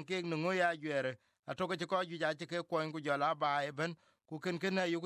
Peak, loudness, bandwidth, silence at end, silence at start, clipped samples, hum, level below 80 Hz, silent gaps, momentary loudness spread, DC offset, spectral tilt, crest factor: -20 dBFS; -36 LUFS; 13 kHz; 0 s; 0 s; under 0.1%; none; -80 dBFS; 1.39-1.43 s; 9 LU; under 0.1%; -5.5 dB/octave; 16 dB